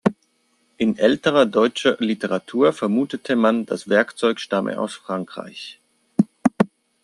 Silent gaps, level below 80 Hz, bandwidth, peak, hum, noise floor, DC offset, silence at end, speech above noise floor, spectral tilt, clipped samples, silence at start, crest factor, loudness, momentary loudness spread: none; -64 dBFS; 11.5 kHz; -2 dBFS; none; -65 dBFS; under 0.1%; 0.35 s; 45 dB; -5.5 dB/octave; under 0.1%; 0.05 s; 18 dB; -21 LUFS; 11 LU